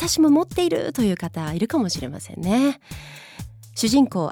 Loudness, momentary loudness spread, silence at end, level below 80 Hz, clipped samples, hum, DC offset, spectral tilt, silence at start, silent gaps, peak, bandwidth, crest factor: -21 LUFS; 20 LU; 0 s; -46 dBFS; under 0.1%; none; under 0.1%; -5 dB/octave; 0 s; none; -8 dBFS; 17.5 kHz; 14 dB